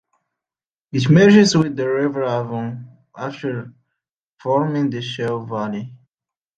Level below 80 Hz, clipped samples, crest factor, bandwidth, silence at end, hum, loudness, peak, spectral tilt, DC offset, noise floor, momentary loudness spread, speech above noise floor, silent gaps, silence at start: -60 dBFS; under 0.1%; 18 dB; 9 kHz; 0.65 s; none; -18 LUFS; -2 dBFS; -6 dB/octave; under 0.1%; under -90 dBFS; 19 LU; over 72 dB; 4.16-4.37 s; 0.95 s